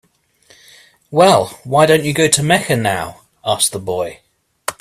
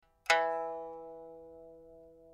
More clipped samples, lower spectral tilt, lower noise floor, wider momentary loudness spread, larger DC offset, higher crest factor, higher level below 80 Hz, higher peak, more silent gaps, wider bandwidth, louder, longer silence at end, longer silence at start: neither; first, -3.5 dB/octave vs -1 dB/octave; about the same, -53 dBFS vs -56 dBFS; second, 15 LU vs 25 LU; neither; second, 16 dB vs 26 dB; first, -52 dBFS vs -72 dBFS; first, 0 dBFS vs -12 dBFS; neither; about the same, 16 kHz vs 15 kHz; first, -15 LUFS vs -33 LUFS; about the same, 0.1 s vs 0 s; first, 1.1 s vs 0.25 s